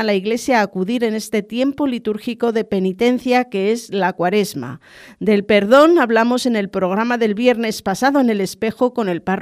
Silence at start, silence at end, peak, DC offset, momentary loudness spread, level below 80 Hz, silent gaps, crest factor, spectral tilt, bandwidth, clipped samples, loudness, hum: 0 s; 0 s; 0 dBFS; under 0.1%; 9 LU; -56 dBFS; none; 16 dB; -5.5 dB/octave; 15.5 kHz; under 0.1%; -17 LUFS; none